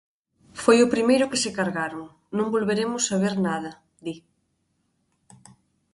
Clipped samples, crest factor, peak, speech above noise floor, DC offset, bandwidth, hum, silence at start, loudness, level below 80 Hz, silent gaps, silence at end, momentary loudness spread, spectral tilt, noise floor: under 0.1%; 22 dB; -4 dBFS; 49 dB; under 0.1%; 11.5 kHz; none; 0.55 s; -23 LUFS; -64 dBFS; none; 1.75 s; 19 LU; -4 dB/octave; -72 dBFS